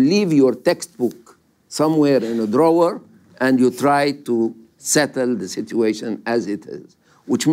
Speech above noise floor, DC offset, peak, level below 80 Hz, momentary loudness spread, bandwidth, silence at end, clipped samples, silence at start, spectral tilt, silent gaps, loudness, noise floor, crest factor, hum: 33 dB; under 0.1%; -4 dBFS; -66 dBFS; 11 LU; 16 kHz; 0 s; under 0.1%; 0 s; -5 dB/octave; none; -19 LUFS; -51 dBFS; 14 dB; none